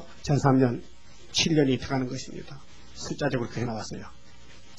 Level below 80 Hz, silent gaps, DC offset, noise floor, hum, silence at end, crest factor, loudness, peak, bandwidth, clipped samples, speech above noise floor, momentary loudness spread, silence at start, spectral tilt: -52 dBFS; none; 0.8%; -52 dBFS; none; 0.25 s; 22 dB; -27 LUFS; -6 dBFS; 11.5 kHz; under 0.1%; 26 dB; 21 LU; 0 s; -5 dB/octave